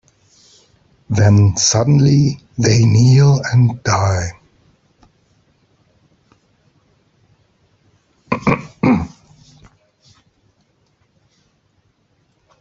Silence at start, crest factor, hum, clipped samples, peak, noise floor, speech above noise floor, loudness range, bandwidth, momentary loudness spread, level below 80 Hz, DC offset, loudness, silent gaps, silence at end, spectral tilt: 1.1 s; 16 dB; none; under 0.1%; -2 dBFS; -61 dBFS; 49 dB; 13 LU; 7.8 kHz; 10 LU; -46 dBFS; under 0.1%; -14 LUFS; none; 3.5 s; -5.5 dB/octave